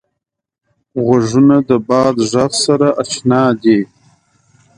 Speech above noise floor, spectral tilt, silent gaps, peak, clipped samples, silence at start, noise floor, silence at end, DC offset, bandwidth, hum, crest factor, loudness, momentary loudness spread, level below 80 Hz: 65 dB; -5.5 dB/octave; none; 0 dBFS; under 0.1%; 0.95 s; -76 dBFS; 0.9 s; under 0.1%; 11 kHz; none; 14 dB; -13 LUFS; 6 LU; -52 dBFS